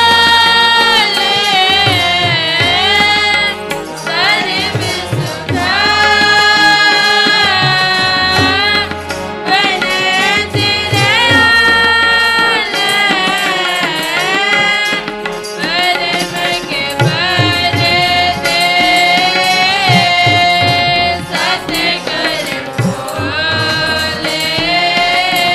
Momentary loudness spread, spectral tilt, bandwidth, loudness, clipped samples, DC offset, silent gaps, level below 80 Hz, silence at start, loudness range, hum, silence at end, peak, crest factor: 9 LU; -3 dB/octave; 16 kHz; -10 LUFS; under 0.1%; under 0.1%; none; -42 dBFS; 0 s; 4 LU; none; 0 s; 0 dBFS; 12 dB